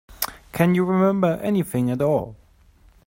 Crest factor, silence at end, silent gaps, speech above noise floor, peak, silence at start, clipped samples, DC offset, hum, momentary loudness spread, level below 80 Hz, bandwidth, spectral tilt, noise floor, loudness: 20 dB; 0.75 s; none; 34 dB; -2 dBFS; 0.1 s; under 0.1%; under 0.1%; none; 10 LU; -52 dBFS; 16.5 kHz; -7 dB/octave; -54 dBFS; -21 LUFS